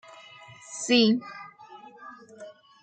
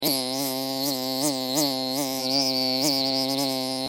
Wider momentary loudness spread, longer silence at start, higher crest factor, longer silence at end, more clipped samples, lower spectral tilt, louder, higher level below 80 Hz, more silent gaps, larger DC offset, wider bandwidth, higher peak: first, 26 LU vs 4 LU; first, 0.7 s vs 0 s; about the same, 22 dB vs 18 dB; first, 0.35 s vs 0 s; neither; about the same, -3.5 dB/octave vs -2.5 dB/octave; about the same, -23 LUFS vs -24 LUFS; second, -78 dBFS vs -72 dBFS; neither; neither; second, 9.4 kHz vs 17 kHz; about the same, -8 dBFS vs -8 dBFS